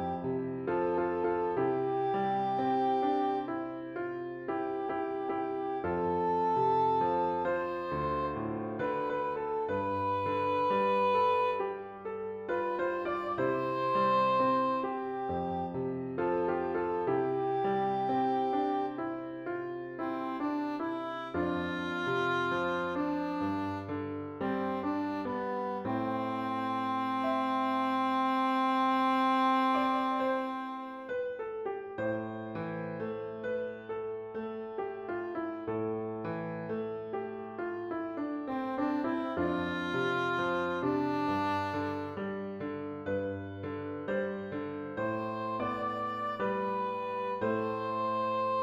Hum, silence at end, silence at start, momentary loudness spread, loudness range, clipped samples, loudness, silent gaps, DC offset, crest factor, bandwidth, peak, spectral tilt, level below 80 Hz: none; 0 s; 0 s; 10 LU; 7 LU; under 0.1%; -33 LUFS; none; under 0.1%; 16 dB; 13.5 kHz; -18 dBFS; -7.5 dB/octave; -66 dBFS